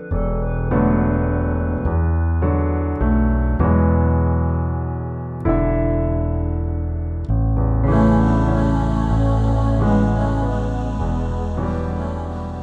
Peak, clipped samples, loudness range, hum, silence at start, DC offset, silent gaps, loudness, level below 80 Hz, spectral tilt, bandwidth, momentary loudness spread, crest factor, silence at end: -4 dBFS; under 0.1%; 3 LU; none; 0 s; under 0.1%; none; -20 LUFS; -24 dBFS; -10 dB/octave; 7.8 kHz; 8 LU; 14 dB; 0 s